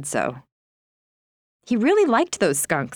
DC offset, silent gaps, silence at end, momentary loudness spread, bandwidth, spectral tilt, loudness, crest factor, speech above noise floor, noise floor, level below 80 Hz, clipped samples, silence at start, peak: under 0.1%; 0.52-1.60 s; 0 s; 8 LU; over 20 kHz; -4 dB/octave; -21 LUFS; 16 dB; over 69 dB; under -90 dBFS; -66 dBFS; under 0.1%; 0 s; -6 dBFS